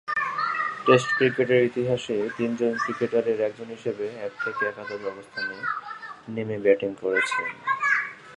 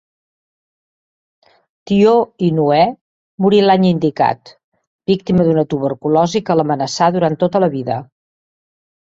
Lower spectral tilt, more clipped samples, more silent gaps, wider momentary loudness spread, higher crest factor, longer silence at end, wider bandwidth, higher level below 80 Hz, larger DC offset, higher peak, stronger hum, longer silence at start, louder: second, -5.5 dB/octave vs -7 dB/octave; neither; second, none vs 3.01-3.38 s, 4.64-4.72 s, 4.87-4.99 s; first, 12 LU vs 7 LU; first, 22 dB vs 16 dB; second, 0 s vs 1.15 s; first, 11 kHz vs 7.8 kHz; second, -68 dBFS vs -54 dBFS; neither; about the same, -4 dBFS vs -2 dBFS; neither; second, 0.05 s vs 1.85 s; second, -25 LUFS vs -15 LUFS